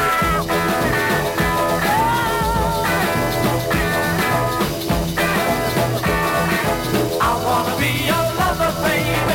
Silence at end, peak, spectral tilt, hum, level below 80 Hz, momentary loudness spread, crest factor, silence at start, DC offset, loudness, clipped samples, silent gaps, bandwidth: 0 s; -4 dBFS; -4.5 dB/octave; none; -34 dBFS; 2 LU; 14 dB; 0 s; under 0.1%; -18 LUFS; under 0.1%; none; 17 kHz